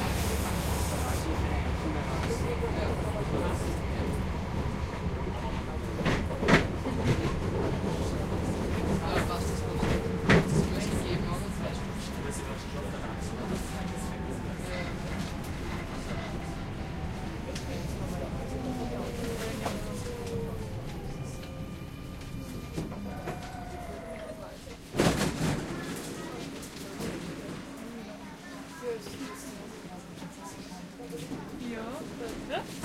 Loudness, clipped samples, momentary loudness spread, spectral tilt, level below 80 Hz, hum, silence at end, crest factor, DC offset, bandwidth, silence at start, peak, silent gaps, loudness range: -33 LUFS; under 0.1%; 12 LU; -5.5 dB/octave; -40 dBFS; none; 0 s; 24 dB; under 0.1%; 16 kHz; 0 s; -8 dBFS; none; 11 LU